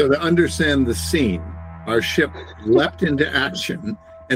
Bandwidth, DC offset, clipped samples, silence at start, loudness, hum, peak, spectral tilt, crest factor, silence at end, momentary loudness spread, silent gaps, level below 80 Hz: 16 kHz; under 0.1%; under 0.1%; 0 s; -19 LUFS; none; -4 dBFS; -5 dB/octave; 16 dB; 0 s; 13 LU; none; -38 dBFS